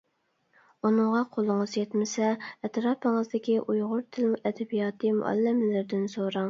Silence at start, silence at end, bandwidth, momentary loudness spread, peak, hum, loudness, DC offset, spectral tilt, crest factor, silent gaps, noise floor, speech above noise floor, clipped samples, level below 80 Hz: 0.85 s; 0 s; 7.6 kHz; 5 LU; -12 dBFS; none; -28 LUFS; under 0.1%; -6 dB/octave; 14 dB; none; -73 dBFS; 46 dB; under 0.1%; -78 dBFS